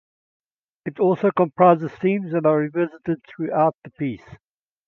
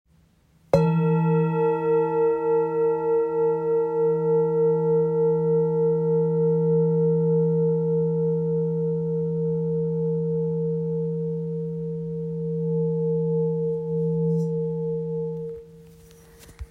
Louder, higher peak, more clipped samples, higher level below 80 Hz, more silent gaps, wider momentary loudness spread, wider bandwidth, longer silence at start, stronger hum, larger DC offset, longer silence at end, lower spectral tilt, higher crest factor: about the same, -21 LUFS vs -23 LUFS; first, 0 dBFS vs -4 dBFS; neither; second, -64 dBFS vs -56 dBFS; first, 3.75-3.82 s vs none; first, 13 LU vs 8 LU; first, 5.8 kHz vs 4.4 kHz; about the same, 0.85 s vs 0.75 s; neither; neither; first, 0.5 s vs 0.05 s; about the same, -10 dB/octave vs -10.5 dB/octave; about the same, 22 dB vs 18 dB